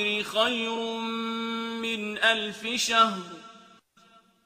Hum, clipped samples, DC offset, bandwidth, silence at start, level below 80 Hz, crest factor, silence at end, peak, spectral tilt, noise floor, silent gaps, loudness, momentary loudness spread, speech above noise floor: none; under 0.1%; under 0.1%; 15.5 kHz; 0 s; -72 dBFS; 22 dB; 0.85 s; -6 dBFS; -2 dB/octave; -59 dBFS; none; -26 LUFS; 9 LU; 32 dB